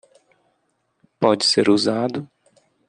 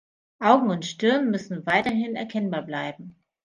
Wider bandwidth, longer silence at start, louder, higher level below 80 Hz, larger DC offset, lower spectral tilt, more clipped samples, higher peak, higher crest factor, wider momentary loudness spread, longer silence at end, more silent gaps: about the same, 10 kHz vs 10 kHz; first, 1.2 s vs 0.4 s; first, -18 LUFS vs -24 LUFS; about the same, -66 dBFS vs -66 dBFS; neither; second, -4 dB/octave vs -5.5 dB/octave; neither; about the same, -2 dBFS vs -2 dBFS; about the same, 20 dB vs 22 dB; about the same, 10 LU vs 12 LU; first, 0.65 s vs 0.35 s; neither